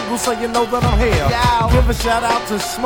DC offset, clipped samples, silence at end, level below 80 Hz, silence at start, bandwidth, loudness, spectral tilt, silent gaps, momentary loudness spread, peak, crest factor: under 0.1%; under 0.1%; 0 s; -22 dBFS; 0 s; over 20 kHz; -16 LUFS; -5 dB/octave; none; 4 LU; -2 dBFS; 14 dB